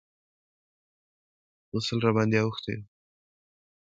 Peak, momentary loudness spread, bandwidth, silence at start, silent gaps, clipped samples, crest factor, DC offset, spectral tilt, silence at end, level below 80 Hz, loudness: -10 dBFS; 12 LU; 7.8 kHz; 1.75 s; none; under 0.1%; 22 dB; under 0.1%; -6 dB/octave; 1.05 s; -64 dBFS; -27 LUFS